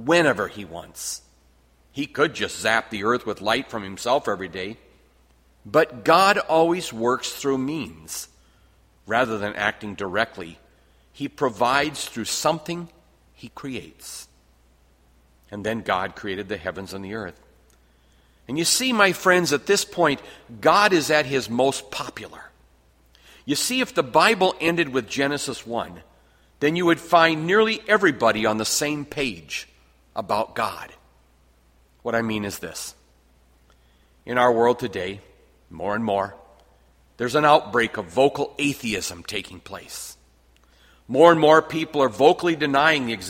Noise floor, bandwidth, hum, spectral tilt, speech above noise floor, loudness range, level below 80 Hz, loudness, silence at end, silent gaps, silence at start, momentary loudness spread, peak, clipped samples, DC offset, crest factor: -58 dBFS; 16.5 kHz; none; -3.5 dB/octave; 36 dB; 10 LU; -56 dBFS; -22 LUFS; 0 s; none; 0 s; 17 LU; 0 dBFS; under 0.1%; under 0.1%; 24 dB